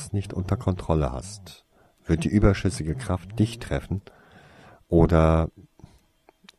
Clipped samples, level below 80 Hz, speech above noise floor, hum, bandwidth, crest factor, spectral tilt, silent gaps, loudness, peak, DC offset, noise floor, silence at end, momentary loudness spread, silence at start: under 0.1%; -34 dBFS; 36 dB; none; 12.5 kHz; 20 dB; -7.5 dB/octave; none; -24 LUFS; -4 dBFS; under 0.1%; -60 dBFS; 0.95 s; 14 LU; 0 s